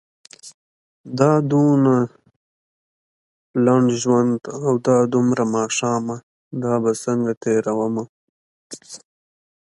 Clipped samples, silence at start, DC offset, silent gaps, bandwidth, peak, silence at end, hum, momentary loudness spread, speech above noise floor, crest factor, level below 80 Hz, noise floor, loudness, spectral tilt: under 0.1%; 0.45 s; under 0.1%; 0.54-1.04 s, 2.36-3.54 s, 6.23-6.51 s, 7.37-7.41 s, 8.09-8.70 s; 11.5 kHz; 0 dBFS; 0.75 s; none; 18 LU; over 72 dB; 20 dB; -64 dBFS; under -90 dBFS; -19 LUFS; -6.5 dB/octave